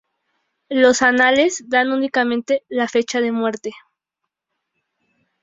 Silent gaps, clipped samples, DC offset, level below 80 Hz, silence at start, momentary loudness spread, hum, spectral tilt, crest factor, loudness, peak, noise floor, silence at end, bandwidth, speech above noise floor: none; under 0.1%; under 0.1%; -64 dBFS; 0.7 s; 10 LU; none; -2.5 dB/octave; 18 dB; -17 LUFS; -2 dBFS; -81 dBFS; 1.65 s; 7.8 kHz; 63 dB